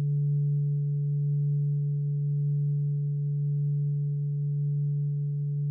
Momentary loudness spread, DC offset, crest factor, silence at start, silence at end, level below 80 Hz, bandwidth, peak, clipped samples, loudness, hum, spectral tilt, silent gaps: 3 LU; under 0.1%; 6 dB; 0 s; 0 s; -72 dBFS; 0.5 kHz; -22 dBFS; under 0.1%; -28 LUFS; none; -16 dB/octave; none